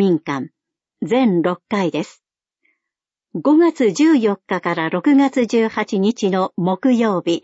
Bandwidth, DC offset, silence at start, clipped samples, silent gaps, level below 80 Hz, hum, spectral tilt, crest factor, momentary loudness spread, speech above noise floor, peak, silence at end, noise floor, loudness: 8 kHz; under 0.1%; 0 s; under 0.1%; none; -68 dBFS; none; -6.5 dB/octave; 12 dB; 12 LU; 68 dB; -6 dBFS; 0.05 s; -85 dBFS; -17 LUFS